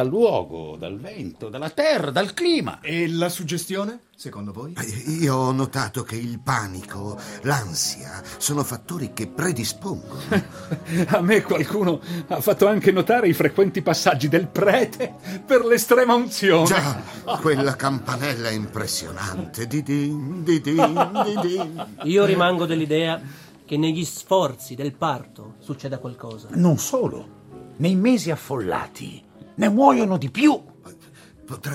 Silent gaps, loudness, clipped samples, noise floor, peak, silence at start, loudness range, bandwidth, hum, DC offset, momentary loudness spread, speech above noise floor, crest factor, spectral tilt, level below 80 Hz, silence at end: none; -22 LUFS; under 0.1%; -48 dBFS; -2 dBFS; 0 s; 7 LU; 16.5 kHz; none; under 0.1%; 16 LU; 26 dB; 20 dB; -5 dB/octave; -60 dBFS; 0 s